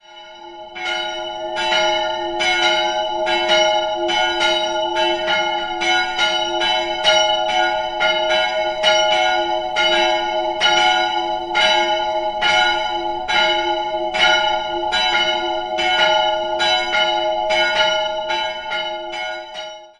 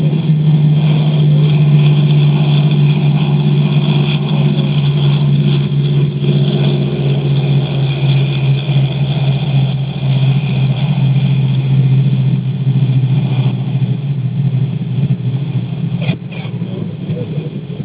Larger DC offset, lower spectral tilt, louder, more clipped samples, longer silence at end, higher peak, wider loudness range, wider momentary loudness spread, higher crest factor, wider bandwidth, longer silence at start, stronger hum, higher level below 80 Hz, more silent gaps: neither; second, -1.5 dB/octave vs -12 dB/octave; second, -17 LUFS vs -13 LUFS; neither; first, 0.15 s vs 0 s; about the same, -2 dBFS vs 0 dBFS; second, 2 LU vs 5 LU; about the same, 9 LU vs 8 LU; first, 18 dB vs 12 dB; first, 11 kHz vs 4 kHz; about the same, 0.1 s vs 0 s; neither; second, -50 dBFS vs -42 dBFS; neither